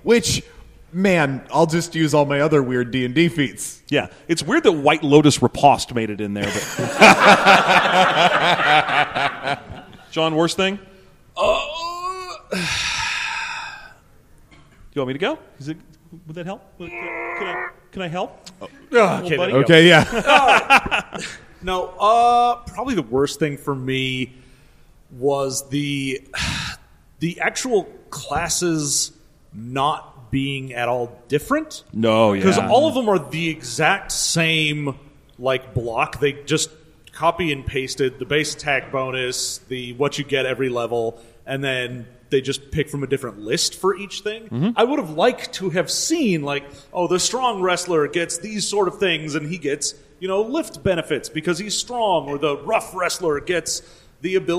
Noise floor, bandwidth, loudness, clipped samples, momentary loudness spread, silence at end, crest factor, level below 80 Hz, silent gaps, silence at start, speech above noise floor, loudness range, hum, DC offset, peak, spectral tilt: -50 dBFS; 15.5 kHz; -19 LUFS; under 0.1%; 15 LU; 0 s; 20 dB; -48 dBFS; none; 0.05 s; 30 dB; 10 LU; none; under 0.1%; 0 dBFS; -4 dB/octave